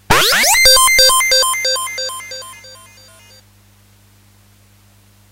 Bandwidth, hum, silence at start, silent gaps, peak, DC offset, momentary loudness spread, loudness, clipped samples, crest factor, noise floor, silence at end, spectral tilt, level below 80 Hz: 16 kHz; 50 Hz at -50 dBFS; 0.1 s; none; 0 dBFS; under 0.1%; 21 LU; -10 LUFS; under 0.1%; 16 dB; -49 dBFS; 2.55 s; 0.5 dB/octave; -38 dBFS